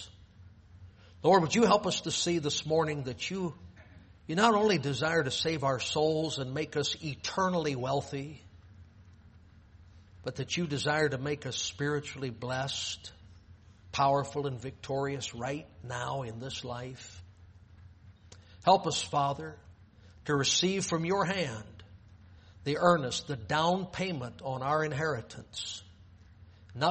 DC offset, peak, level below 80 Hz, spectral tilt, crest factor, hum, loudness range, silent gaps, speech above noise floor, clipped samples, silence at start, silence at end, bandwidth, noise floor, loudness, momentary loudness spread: under 0.1%; -10 dBFS; -60 dBFS; -4 dB/octave; 22 dB; none; 7 LU; none; 26 dB; under 0.1%; 0 s; 0 s; 8.4 kHz; -56 dBFS; -31 LUFS; 15 LU